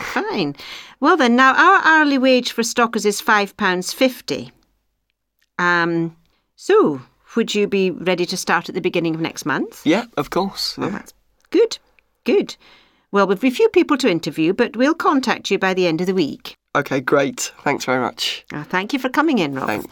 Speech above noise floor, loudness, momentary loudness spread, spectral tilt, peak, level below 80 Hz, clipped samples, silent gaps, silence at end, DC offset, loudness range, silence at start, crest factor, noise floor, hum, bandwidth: 54 dB; -18 LUFS; 12 LU; -4 dB/octave; 0 dBFS; -60 dBFS; under 0.1%; none; 0.05 s; under 0.1%; 6 LU; 0 s; 18 dB; -72 dBFS; none; 18.5 kHz